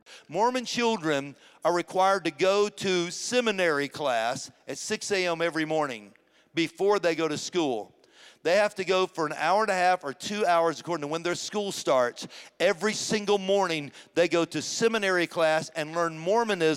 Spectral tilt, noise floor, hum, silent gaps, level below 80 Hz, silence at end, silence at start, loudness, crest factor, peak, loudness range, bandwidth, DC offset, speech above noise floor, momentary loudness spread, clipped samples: -3.5 dB/octave; -55 dBFS; none; none; -74 dBFS; 0 s; 0.1 s; -27 LUFS; 16 dB; -10 dBFS; 2 LU; 15.5 kHz; under 0.1%; 29 dB; 8 LU; under 0.1%